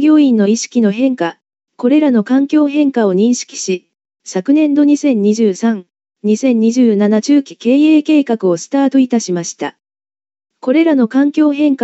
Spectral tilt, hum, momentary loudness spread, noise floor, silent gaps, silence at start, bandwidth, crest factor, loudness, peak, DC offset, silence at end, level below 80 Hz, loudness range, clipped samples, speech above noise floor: -5.5 dB/octave; none; 10 LU; under -90 dBFS; none; 0 s; 8.2 kHz; 10 dB; -13 LUFS; -2 dBFS; under 0.1%; 0 s; -74 dBFS; 2 LU; under 0.1%; over 78 dB